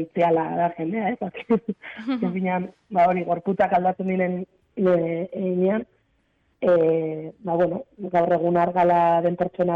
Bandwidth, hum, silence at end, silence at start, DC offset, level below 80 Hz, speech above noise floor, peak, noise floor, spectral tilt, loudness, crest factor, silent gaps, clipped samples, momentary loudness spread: 5.2 kHz; none; 0 s; 0 s; under 0.1%; -62 dBFS; 45 dB; -12 dBFS; -67 dBFS; -9.5 dB/octave; -23 LUFS; 12 dB; none; under 0.1%; 9 LU